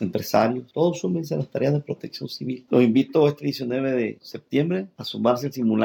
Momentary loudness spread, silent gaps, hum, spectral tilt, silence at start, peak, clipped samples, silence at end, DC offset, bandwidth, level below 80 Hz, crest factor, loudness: 12 LU; none; none; -7 dB/octave; 0 s; -6 dBFS; under 0.1%; 0 s; under 0.1%; 19 kHz; -70 dBFS; 16 dB; -23 LUFS